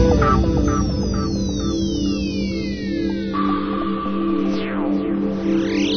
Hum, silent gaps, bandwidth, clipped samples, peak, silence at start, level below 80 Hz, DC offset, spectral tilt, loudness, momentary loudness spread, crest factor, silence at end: none; none; 6.6 kHz; under 0.1%; -2 dBFS; 0 s; -28 dBFS; under 0.1%; -6.5 dB/octave; -21 LUFS; 5 LU; 16 dB; 0 s